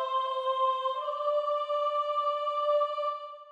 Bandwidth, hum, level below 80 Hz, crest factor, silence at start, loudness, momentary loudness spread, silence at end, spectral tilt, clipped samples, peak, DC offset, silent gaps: 8 kHz; none; under -90 dBFS; 12 dB; 0 s; -29 LUFS; 4 LU; 0 s; 1.5 dB/octave; under 0.1%; -18 dBFS; under 0.1%; none